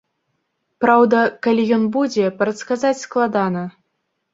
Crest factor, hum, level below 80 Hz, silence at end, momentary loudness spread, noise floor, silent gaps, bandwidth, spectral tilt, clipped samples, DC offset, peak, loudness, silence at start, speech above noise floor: 16 dB; none; -64 dBFS; 0.65 s; 9 LU; -73 dBFS; none; 7.8 kHz; -6 dB/octave; under 0.1%; under 0.1%; -2 dBFS; -18 LUFS; 0.8 s; 56 dB